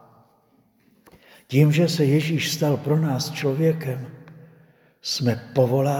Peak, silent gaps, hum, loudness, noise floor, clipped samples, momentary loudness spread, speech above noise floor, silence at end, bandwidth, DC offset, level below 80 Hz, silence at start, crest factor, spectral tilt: -4 dBFS; none; none; -22 LUFS; -61 dBFS; under 0.1%; 10 LU; 40 dB; 0 s; 17.5 kHz; under 0.1%; -66 dBFS; 1.5 s; 18 dB; -6 dB/octave